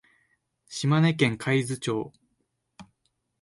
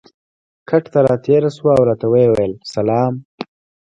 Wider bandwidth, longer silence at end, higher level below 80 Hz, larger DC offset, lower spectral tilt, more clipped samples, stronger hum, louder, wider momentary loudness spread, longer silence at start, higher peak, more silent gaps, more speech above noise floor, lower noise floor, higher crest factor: first, 11.5 kHz vs 9.8 kHz; about the same, 0.6 s vs 0.5 s; second, -66 dBFS vs -50 dBFS; neither; second, -6 dB/octave vs -8 dB/octave; neither; neither; second, -25 LUFS vs -15 LUFS; about the same, 13 LU vs 15 LU; about the same, 0.7 s vs 0.7 s; second, -8 dBFS vs 0 dBFS; second, none vs 3.25-3.38 s; second, 51 dB vs over 76 dB; second, -76 dBFS vs under -90 dBFS; first, 22 dB vs 16 dB